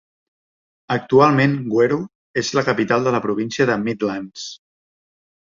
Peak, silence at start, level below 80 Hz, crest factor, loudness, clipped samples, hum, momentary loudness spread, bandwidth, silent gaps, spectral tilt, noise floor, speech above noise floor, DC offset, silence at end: -2 dBFS; 0.9 s; -58 dBFS; 18 dB; -19 LUFS; under 0.1%; none; 13 LU; 7.6 kHz; 2.15-2.34 s; -6 dB/octave; under -90 dBFS; over 72 dB; under 0.1%; 0.85 s